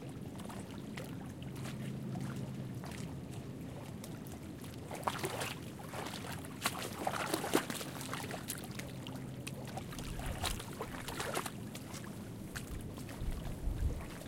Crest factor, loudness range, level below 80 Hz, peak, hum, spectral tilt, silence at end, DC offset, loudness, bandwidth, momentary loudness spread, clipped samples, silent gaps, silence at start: 26 dB; 5 LU; -50 dBFS; -16 dBFS; none; -4.5 dB/octave; 0 s; under 0.1%; -42 LUFS; 17 kHz; 8 LU; under 0.1%; none; 0 s